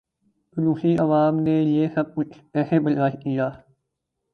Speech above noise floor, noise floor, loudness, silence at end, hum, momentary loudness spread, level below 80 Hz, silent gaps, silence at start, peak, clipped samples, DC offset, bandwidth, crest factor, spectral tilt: 58 dB; -79 dBFS; -22 LUFS; 0.75 s; none; 8 LU; -62 dBFS; none; 0.55 s; -6 dBFS; under 0.1%; under 0.1%; 5 kHz; 16 dB; -10 dB/octave